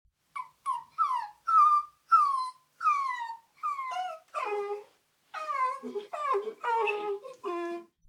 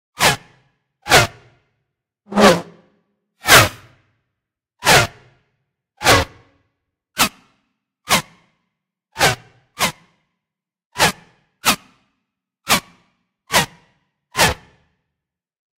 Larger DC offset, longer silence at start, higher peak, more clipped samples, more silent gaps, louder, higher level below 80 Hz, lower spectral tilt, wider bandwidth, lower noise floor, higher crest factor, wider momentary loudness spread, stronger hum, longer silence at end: neither; first, 0.35 s vs 0.2 s; second, -12 dBFS vs 0 dBFS; neither; second, none vs 10.86-10.90 s; second, -30 LUFS vs -16 LUFS; second, -82 dBFS vs -44 dBFS; about the same, -2.5 dB/octave vs -2.5 dB/octave; second, 13 kHz vs 16 kHz; second, -65 dBFS vs -84 dBFS; about the same, 18 dB vs 20 dB; about the same, 15 LU vs 16 LU; neither; second, 0.25 s vs 1.25 s